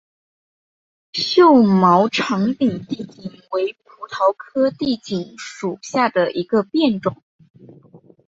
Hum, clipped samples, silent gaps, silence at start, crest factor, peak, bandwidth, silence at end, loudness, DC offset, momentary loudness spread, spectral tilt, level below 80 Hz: none; under 0.1%; 7.23-7.39 s, 7.50-7.54 s; 1.15 s; 18 dB; -2 dBFS; 7.8 kHz; 0.3 s; -18 LUFS; under 0.1%; 17 LU; -6 dB/octave; -60 dBFS